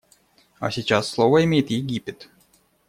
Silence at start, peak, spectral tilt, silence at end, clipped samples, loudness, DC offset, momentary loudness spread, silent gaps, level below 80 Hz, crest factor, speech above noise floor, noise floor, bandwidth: 0.6 s; -4 dBFS; -6 dB/octave; 0.65 s; under 0.1%; -21 LUFS; under 0.1%; 13 LU; none; -56 dBFS; 18 dB; 40 dB; -61 dBFS; 15 kHz